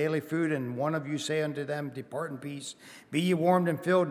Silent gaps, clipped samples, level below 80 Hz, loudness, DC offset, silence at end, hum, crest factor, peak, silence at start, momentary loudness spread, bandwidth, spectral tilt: none; under 0.1%; -80 dBFS; -30 LUFS; under 0.1%; 0 s; none; 18 dB; -12 dBFS; 0 s; 13 LU; 15 kHz; -6 dB/octave